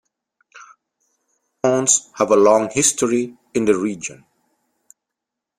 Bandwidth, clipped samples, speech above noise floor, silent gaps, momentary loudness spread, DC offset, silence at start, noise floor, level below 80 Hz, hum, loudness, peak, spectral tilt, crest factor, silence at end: 15.5 kHz; under 0.1%; 66 dB; none; 11 LU; under 0.1%; 0.55 s; -83 dBFS; -60 dBFS; none; -17 LUFS; 0 dBFS; -3.5 dB/octave; 20 dB; 1.45 s